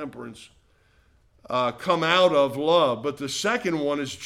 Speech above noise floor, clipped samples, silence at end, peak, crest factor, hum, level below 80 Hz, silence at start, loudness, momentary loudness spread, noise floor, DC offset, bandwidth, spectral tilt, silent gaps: 37 dB; under 0.1%; 0 s; -6 dBFS; 20 dB; none; -64 dBFS; 0 s; -23 LUFS; 11 LU; -61 dBFS; under 0.1%; 14.5 kHz; -4 dB/octave; none